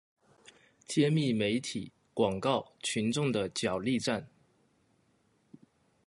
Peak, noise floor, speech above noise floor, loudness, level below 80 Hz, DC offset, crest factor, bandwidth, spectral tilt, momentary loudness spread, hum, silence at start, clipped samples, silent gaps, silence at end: -14 dBFS; -71 dBFS; 40 dB; -31 LUFS; -66 dBFS; under 0.1%; 20 dB; 11.5 kHz; -5 dB/octave; 8 LU; none; 0.9 s; under 0.1%; none; 1.8 s